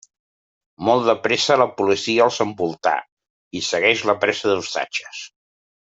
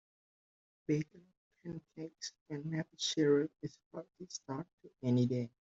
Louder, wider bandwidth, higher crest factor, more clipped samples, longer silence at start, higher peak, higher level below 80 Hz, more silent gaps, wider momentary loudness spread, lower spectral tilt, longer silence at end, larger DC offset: first, -19 LUFS vs -37 LUFS; about the same, 8.2 kHz vs 8 kHz; about the same, 20 dB vs 18 dB; neither; about the same, 0.8 s vs 0.9 s; first, -2 dBFS vs -20 dBFS; first, -66 dBFS vs -78 dBFS; about the same, 3.12-3.17 s, 3.30-3.51 s vs 1.37-1.51 s, 2.41-2.46 s, 3.86-3.91 s, 4.73-4.78 s; second, 10 LU vs 18 LU; second, -3.5 dB/octave vs -6 dB/octave; first, 0.65 s vs 0.3 s; neither